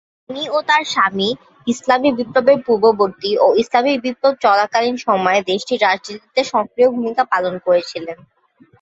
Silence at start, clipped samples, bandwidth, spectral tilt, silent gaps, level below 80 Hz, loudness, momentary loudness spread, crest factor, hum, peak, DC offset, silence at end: 0.3 s; under 0.1%; 8 kHz; -4 dB/octave; none; -62 dBFS; -16 LUFS; 8 LU; 16 dB; none; -2 dBFS; under 0.1%; 0.7 s